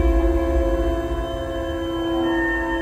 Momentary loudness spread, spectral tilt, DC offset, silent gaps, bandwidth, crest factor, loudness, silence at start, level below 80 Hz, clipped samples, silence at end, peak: 6 LU; -7 dB/octave; under 0.1%; none; 13 kHz; 14 dB; -22 LUFS; 0 s; -24 dBFS; under 0.1%; 0 s; -8 dBFS